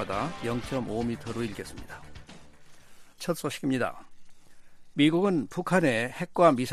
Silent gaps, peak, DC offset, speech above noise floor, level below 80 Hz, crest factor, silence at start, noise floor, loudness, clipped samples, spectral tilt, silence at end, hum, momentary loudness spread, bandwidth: none; -8 dBFS; under 0.1%; 21 dB; -54 dBFS; 22 dB; 0 s; -48 dBFS; -28 LUFS; under 0.1%; -5.5 dB/octave; 0 s; none; 19 LU; 15 kHz